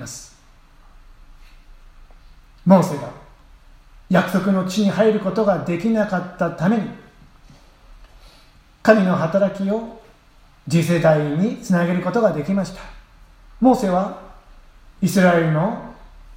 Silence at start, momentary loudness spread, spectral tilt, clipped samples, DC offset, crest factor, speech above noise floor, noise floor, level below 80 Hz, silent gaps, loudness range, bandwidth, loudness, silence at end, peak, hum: 0 s; 15 LU; -7 dB/octave; under 0.1%; under 0.1%; 20 dB; 33 dB; -50 dBFS; -48 dBFS; none; 4 LU; 16 kHz; -19 LUFS; 0 s; 0 dBFS; none